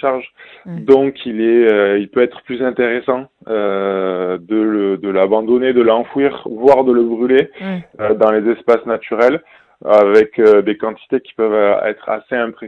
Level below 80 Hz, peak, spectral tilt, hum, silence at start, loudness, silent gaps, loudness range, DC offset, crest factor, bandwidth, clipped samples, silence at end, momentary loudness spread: -56 dBFS; 0 dBFS; -7.5 dB/octave; none; 0 s; -14 LUFS; none; 3 LU; under 0.1%; 14 dB; 5.8 kHz; 0.2%; 0 s; 11 LU